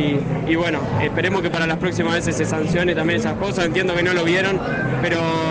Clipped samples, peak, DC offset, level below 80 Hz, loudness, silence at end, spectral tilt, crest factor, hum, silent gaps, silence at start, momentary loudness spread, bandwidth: under 0.1%; -4 dBFS; under 0.1%; -42 dBFS; -20 LUFS; 0 s; -5.5 dB/octave; 16 dB; none; none; 0 s; 3 LU; 9.8 kHz